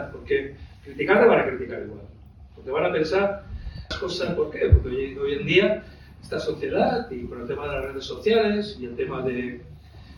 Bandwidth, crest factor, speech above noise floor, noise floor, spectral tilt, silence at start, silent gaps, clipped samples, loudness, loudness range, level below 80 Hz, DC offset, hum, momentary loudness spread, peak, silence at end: 11 kHz; 20 dB; 22 dB; -46 dBFS; -7 dB/octave; 0 s; none; under 0.1%; -24 LUFS; 3 LU; -36 dBFS; under 0.1%; none; 16 LU; -4 dBFS; 0 s